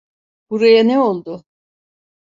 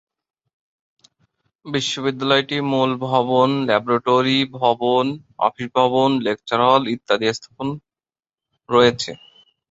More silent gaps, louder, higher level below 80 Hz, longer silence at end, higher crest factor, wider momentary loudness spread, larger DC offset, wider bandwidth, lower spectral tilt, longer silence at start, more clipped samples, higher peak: neither; first, -13 LUFS vs -19 LUFS; second, -66 dBFS vs -60 dBFS; first, 0.95 s vs 0.55 s; about the same, 16 dB vs 18 dB; first, 20 LU vs 10 LU; neither; about the same, 7.6 kHz vs 8 kHz; first, -6.5 dB/octave vs -5 dB/octave; second, 0.5 s vs 1.65 s; neither; about the same, -2 dBFS vs -2 dBFS